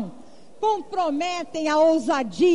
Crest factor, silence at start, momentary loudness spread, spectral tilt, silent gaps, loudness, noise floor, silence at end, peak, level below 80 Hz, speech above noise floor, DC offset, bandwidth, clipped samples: 12 dB; 0 s; 8 LU; -4.5 dB/octave; none; -23 LUFS; -48 dBFS; 0 s; -10 dBFS; -62 dBFS; 27 dB; 0.7%; 10.5 kHz; under 0.1%